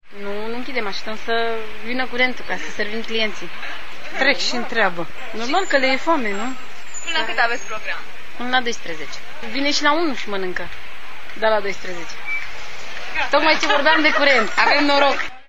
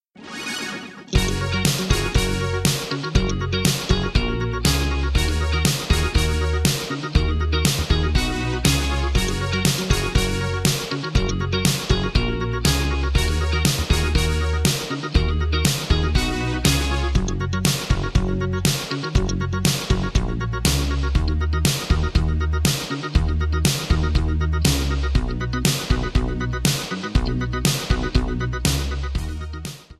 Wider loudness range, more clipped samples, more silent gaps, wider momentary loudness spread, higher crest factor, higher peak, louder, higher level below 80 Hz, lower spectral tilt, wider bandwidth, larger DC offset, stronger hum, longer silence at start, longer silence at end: first, 6 LU vs 1 LU; neither; neither; first, 16 LU vs 4 LU; about the same, 22 dB vs 18 dB; about the same, 0 dBFS vs -2 dBFS; about the same, -20 LUFS vs -21 LUFS; second, -54 dBFS vs -24 dBFS; second, -2.5 dB/octave vs -4.5 dB/octave; first, 15.5 kHz vs 14 kHz; first, 9% vs under 0.1%; neither; second, 0 s vs 0.2 s; about the same, 0 s vs 0.05 s